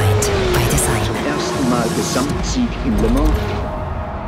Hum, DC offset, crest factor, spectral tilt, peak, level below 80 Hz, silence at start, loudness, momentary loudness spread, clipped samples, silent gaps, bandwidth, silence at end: none; under 0.1%; 14 dB; -5 dB/octave; -4 dBFS; -24 dBFS; 0 s; -18 LUFS; 7 LU; under 0.1%; none; 16 kHz; 0 s